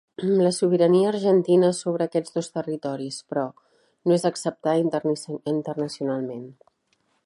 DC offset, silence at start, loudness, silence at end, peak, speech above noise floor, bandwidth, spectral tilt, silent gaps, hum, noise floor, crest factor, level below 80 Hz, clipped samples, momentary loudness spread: under 0.1%; 0.2 s; -24 LUFS; 0.75 s; -8 dBFS; 47 dB; 11.5 kHz; -6 dB/octave; none; none; -69 dBFS; 16 dB; -74 dBFS; under 0.1%; 11 LU